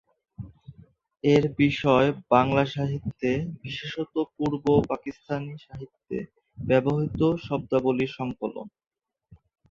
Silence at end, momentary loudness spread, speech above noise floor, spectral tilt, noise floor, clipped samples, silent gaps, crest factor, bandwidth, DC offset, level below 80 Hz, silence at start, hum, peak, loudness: 0.35 s; 20 LU; 32 dB; -7.5 dB/octave; -57 dBFS; under 0.1%; none; 20 dB; 7.4 kHz; under 0.1%; -52 dBFS; 0.4 s; none; -6 dBFS; -25 LUFS